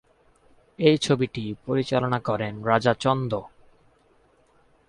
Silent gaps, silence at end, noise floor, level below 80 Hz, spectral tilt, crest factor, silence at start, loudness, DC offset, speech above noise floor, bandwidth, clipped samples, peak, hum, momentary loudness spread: none; 1.4 s; -61 dBFS; -58 dBFS; -6 dB/octave; 20 dB; 0.8 s; -24 LUFS; under 0.1%; 38 dB; 11.5 kHz; under 0.1%; -6 dBFS; none; 8 LU